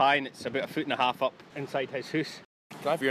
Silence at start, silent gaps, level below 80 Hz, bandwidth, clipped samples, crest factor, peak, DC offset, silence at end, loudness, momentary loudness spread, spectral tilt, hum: 0 s; 2.45-2.70 s; -74 dBFS; 15 kHz; under 0.1%; 18 dB; -12 dBFS; under 0.1%; 0 s; -31 LUFS; 12 LU; -4.5 dB/octave; none